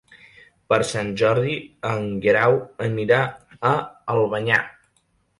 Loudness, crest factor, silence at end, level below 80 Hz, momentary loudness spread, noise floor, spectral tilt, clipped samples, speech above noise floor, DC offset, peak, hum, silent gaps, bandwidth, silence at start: -21 LUFS; 18 dB; 0.7 s; -56 dBFS; 9 LU; -66 dBFS; -5.5 dB/octave; under 0.1%; 45 dB; under 0.1%; -4 dBFS; none; none; 11.5 kHz; 0.7 s